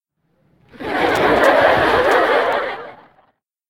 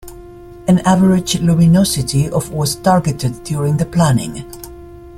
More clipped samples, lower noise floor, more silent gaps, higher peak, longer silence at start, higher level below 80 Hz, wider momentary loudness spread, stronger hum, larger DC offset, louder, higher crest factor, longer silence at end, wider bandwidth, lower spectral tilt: neither; first, -63 dBFS vs -35 dBFS; neither; about the same, 0 dBFS vs 0 dBFS; first, 0.8 s vs 0.05 s; second, -46 dBFS vs -38 dBFS; about the same, 14 LU vs 15 LU; neither; neither; about the same, -15 LUFS vs -14 LUFS; about the same, 16 dB vs 14 dB; first, 0.75 s vs 0 s; about the same, 16.5 kHz vs 15.5 kHz; second, -4.5 dB/octave vs -6 dB/octave